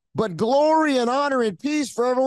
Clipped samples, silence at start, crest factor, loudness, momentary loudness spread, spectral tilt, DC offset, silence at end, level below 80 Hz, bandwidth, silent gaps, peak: under 0.1%; 0.15 s; 12 dB; -21 LUFS; 7 LU; -5 dB/octave; under 0.1%; 0 s; -66 dBFS; 12.5 kHz; none; -8 dBFS